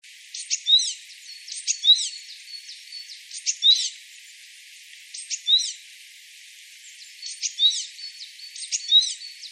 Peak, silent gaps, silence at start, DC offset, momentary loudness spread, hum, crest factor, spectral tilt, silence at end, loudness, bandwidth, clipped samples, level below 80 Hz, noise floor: -6 dBFS; none; 0.05 s; under 0.1%; 25 LU; none; 20 dB; 14 dB/octave; 0 s; -20 LUFS; 14.5 kHz; under 0.1%; under -90 dBFS; -47 dBFS